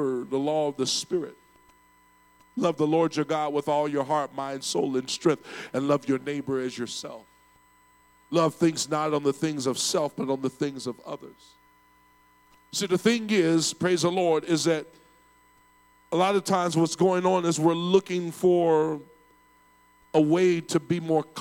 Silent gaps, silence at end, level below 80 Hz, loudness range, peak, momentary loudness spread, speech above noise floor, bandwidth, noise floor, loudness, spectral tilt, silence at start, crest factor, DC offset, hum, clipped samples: none; 0 s; -72 dBFS; 5 LU; -6 dBFS; 9 LU; 35 dB; 17 kHz; -60 dBFS; -26 LUFS; -5 dB/octave; 0 s; 20 dB; under 0.1%; 60 Hz at -60 dBFS; under 0.1%